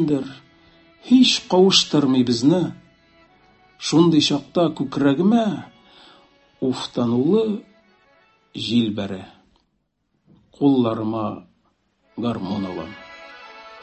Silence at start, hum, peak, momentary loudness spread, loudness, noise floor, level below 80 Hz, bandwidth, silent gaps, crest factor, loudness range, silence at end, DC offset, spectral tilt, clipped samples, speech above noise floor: 0 s; none; -2 dBFS; 21 LU; -19 LUFS; -71 dBFS; -58 dBFS; 8.6 kHz; none; 18 dB; 7 LU; 0.05 s; under 0.1%; -5 dB/octave; under 0.1%; 52 dB